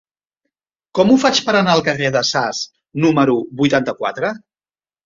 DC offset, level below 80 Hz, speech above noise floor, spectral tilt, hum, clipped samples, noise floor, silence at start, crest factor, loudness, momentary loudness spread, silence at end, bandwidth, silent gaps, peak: under 0.1%; -56 dBFS; over 74 dB; -4.5 dB/octave; none; under 0.1%; under -90 dBFS; 0.95 s; 16 dB; -16 LUFS; 11 LU; 0.7 s; 7.6 kHz; none; -2 dBFS